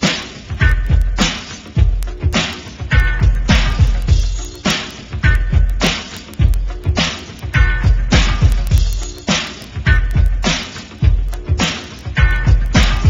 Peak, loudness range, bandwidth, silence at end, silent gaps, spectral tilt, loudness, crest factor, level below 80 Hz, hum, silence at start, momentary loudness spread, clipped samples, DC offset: 0 dBFS; 2 LU; 10.5 kHz; 0 s; none; -4.5 dB/octave; -17 LUFS; 14 dB; -16 dBFS; none; 0 s; 8 LU; under 0.1%; under 0.1%